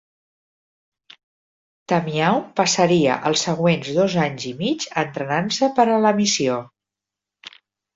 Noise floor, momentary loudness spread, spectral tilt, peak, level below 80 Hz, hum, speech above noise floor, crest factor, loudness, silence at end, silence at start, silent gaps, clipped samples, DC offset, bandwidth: -86 dBFS; 8 LU; -4.5 dB/octave; -4 dBFS; -62 dBFS; none; 67 dB; 18 dB; -20 LUFS; 0.45 s; 1.9 s; none; under 0.1%; under 0.1%; 7.8 kHz